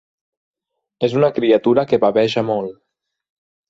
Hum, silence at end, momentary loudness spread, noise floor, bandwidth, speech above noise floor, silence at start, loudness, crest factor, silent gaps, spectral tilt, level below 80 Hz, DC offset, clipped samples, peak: none; 1 s; 8 LU; -73 dBFS; 7.8 kHz; 57 dB; 1 s; -17 LUFS; 16 dB; none; -7 dB/octave; -60 dBFS; under 0.1%; under 0.1%; -2 dBFS